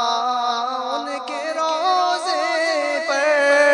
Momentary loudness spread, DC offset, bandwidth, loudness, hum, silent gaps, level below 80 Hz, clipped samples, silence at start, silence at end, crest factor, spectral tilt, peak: 9 LU; under 0.1%; 10.5 kHz; -20 LUFS; none; none; -74 dBFS; under 0.1%; 0 s; 0 s; 16 dB; 0 dB/octave; -2 dBFS